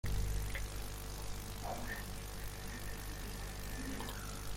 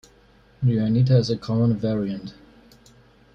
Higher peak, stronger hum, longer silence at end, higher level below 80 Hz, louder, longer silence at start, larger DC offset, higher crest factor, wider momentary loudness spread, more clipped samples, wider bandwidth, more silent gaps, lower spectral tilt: second, -26 dBFS vs -8 dBFS; first, 50 Hz at -45 dBFS vs none; second, 0 s vs 1.05 s; first, -44 dBFS vs -52 dBFS; second, -44 LUFS vs -22 LUFS; second, 0.05 s vs 0.6 s; neither; about the same, 16 dB vs 16 dB; second, 5 LU vs 12 LU; neither; first, 16.5 kHz vs 7.2 kHz; neither; second, -4 dB/octave vs -8.5 dB/octave